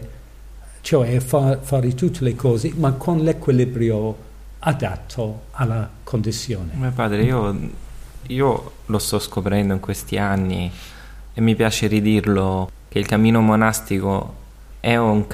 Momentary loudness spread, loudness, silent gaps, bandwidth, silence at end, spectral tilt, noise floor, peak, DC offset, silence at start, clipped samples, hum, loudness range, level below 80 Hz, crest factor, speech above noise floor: 11 LU; -20 LUFS; none; 15.5 kHz; 0 s; -6.5 dB/octave; -39 dBFS; -4 dBFS; under 0.1%; 0 s; under 0.1%; none; 5 LU; -38 dBFS; 16 dB; 20 dB